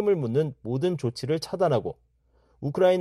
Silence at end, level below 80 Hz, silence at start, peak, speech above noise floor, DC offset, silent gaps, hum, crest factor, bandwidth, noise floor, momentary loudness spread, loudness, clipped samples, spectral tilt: 0 s; -60 dBFS; 0 s; -10 dBFS; 39 dB; under 0.1%; none; none; 16 dB; 13.5 kHz; -64 dBFS; 11 LU; -27 LUFS; under 0.1%; -7 dB/octave